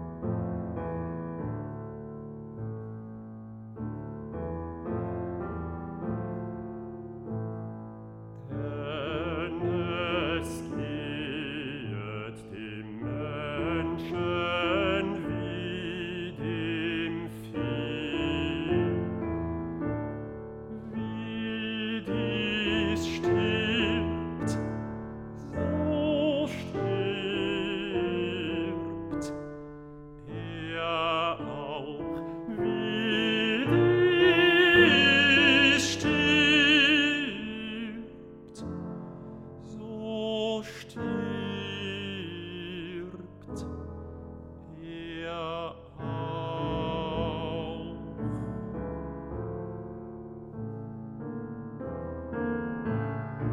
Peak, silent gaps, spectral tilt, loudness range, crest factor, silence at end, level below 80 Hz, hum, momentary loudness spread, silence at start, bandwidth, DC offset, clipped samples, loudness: -8 dBFS; none; -5 dB/octave; 16 LU; 22 dB; 0 s; -52 dBFS; none; 19 LU; 0 s; 13 kHz; under 0.1%; under 0.1%; -29 LUFS